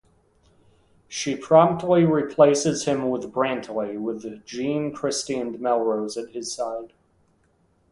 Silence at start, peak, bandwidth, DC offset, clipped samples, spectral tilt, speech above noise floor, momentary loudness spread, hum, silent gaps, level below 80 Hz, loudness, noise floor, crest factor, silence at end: 1.1 s; -2 dBFS; 11.5 kHz; under 0.1%; under 0.1%; -5 dB/octave; 42 dB; 13 LU; none; none; -62 dBFS; -23 LUFS; -64 dBFS; 22 dB; 1.05 s